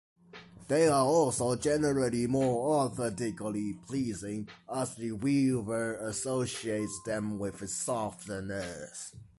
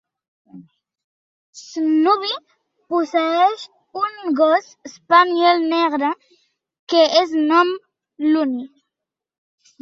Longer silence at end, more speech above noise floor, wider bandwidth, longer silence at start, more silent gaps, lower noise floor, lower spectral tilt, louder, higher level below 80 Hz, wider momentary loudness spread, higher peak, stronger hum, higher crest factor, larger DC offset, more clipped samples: second, 0.15 s vs 1.15 s; second, 21 dB vs 68 dB; first, 11.5 kHz vs 7.6 kHz; second, 0.35 s vs 0.55 s; second, none vs 1.04-1.53 s, 6.79-6.87 s; second, -52 dBFS vs -85 dBFS; first, -5 dB/octave vs -3 dB/octave; second, -31 LUFS vs -18 LUFS; first, -60 dBFS vs -72 dBFS; second, 12 LU vs 16 LU; second, -14 dBFS vs -2 dBFS; neither; about the same, 16 dB vs 18 dB; neither; neither